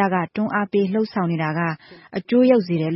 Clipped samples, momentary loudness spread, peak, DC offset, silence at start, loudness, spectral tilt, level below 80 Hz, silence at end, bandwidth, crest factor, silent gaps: under 0.1%; 13 LU; -4 dBFS; under 0.1%; 0 s; -20 LUFS; -12 dB/octave; -64 dBFS; 0 s; 5.8 kHz; 16 dB; none